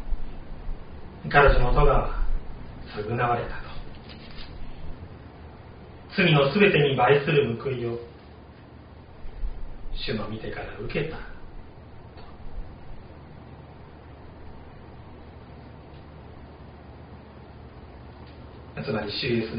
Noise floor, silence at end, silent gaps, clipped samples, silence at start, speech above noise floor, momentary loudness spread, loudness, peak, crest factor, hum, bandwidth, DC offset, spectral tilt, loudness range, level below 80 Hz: -46 dBFS; 0 s; none; under 0.1%; 0 s; 24 dB; 26 LU; -24 LUFS; -4 dBFS; 24 dB; none; 5.2 kHz; under 0.1%; -4 dB/octave; 22 LU; -34 dBFS